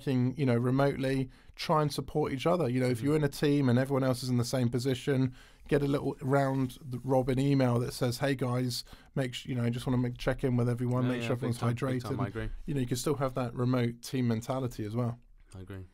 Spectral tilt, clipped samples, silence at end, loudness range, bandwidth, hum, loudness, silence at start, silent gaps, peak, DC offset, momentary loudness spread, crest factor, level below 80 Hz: -6.5 dB/octave; under 0.1%; 0.1 s; 3 LU; 16 kHz; none; -31 LUFS; 0 s; none; -14 dBFS; under 0.1%; 7 LU; 16 dB; -52 dBFS